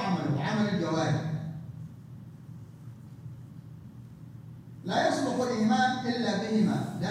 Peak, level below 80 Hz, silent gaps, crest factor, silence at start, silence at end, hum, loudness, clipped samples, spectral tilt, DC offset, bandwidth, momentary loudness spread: -14 dBFS; -64 dBFS; none; 16 dB; 0 s; 0 s; none; -28 LUFS; under 0.1%; -6 dB/octave; under 0.1%; 12 kHz; 21 LU